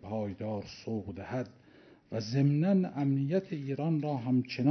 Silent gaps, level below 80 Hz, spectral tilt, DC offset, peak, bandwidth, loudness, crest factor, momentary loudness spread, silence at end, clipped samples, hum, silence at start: none; -68 dBFS; -8.5 dB/octave; under 0.1%; -16 dBFS; 6.4 kHz; -32 LUFS; 14 dB; 11 LU; 0 s; under 0.1%; none; 0 s